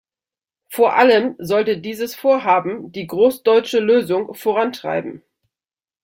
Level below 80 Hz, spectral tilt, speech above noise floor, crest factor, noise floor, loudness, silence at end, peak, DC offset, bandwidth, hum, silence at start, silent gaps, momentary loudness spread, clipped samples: -64 dBFS; -5 dB/octave; over 73 dB; 16 dB; under -90 dBFS; -17 LUFS; 0.85 s; -2 dBFS; under 0.1%; 17 kHz; none; 0.7 s; none; 13 LU; under 0.1%